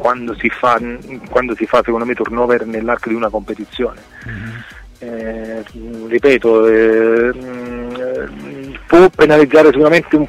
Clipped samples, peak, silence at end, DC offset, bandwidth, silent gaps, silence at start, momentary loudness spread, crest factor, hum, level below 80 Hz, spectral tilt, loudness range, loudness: under 0.1%; 0 dBFS; 0 s; under 0.1%; 11 kHz; none; 0 s; 21 LU; 14 dB; none; -40 dBFS; -6.5 dB/octave; 9 LU; -13 LUFS